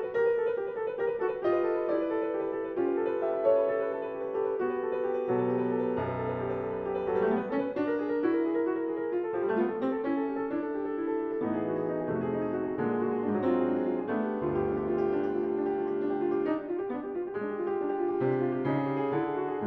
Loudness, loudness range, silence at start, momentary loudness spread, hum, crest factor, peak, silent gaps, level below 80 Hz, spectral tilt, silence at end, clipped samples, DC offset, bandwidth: -30 LUFS; 2 LU; 0 s; 5 LU; none; 16 dB; -14 dBFS; none; -62 dBFS; -10 dB/octave; 0 s; under 0.1%; under 0.1%; 4.9 kHz